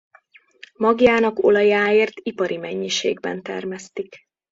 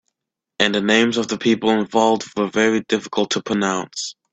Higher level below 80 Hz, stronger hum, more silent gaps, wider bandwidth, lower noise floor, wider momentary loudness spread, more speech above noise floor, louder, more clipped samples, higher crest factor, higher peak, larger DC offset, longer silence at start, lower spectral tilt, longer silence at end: about the same, -58 dBFS vs -60 dBFS; neither; neither; about the same, 7.8 kHz vs 8.4 kHz; second, -54 dBFS vs -83 dBFS; first, 15 LU vs 6 LU; second, 34 dB vs 64 dB; about the same, -19 LUFS vs -19 LUFS; neither; about the same, 18 dB vs 20 dB; about the same, -2 dBFS vs 0 dBFS; neither; first, 0.8 s vs 0.6 s; about the same, -4 dB/octave vs -4 dB/octave; first, 0.35 s vs 0.2 s